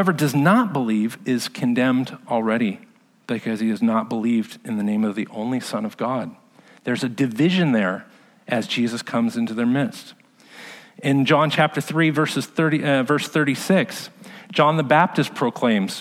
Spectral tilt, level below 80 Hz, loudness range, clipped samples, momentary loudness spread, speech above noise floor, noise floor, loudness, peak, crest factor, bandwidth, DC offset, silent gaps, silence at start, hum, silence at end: -6 dB/octave; -72 dBFS; 4 LU; under 0.1%; 11 LU; 23 dB; -43 dBFS; -21 LUFS; -2 dBFS; 18 dB; 15.5 kHz; under 0.1%; none; 0 s; none; 0 s